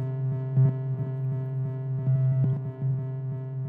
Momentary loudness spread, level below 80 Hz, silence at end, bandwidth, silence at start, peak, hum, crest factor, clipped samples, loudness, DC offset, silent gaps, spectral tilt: 7 LU; -64 dBFS; 0 s; 2.1 kHz; 0 s; -14 dBFS; none; 12 dB; under 0.1%; -28 LUFS; under 0.1%; none; -13 dB/octave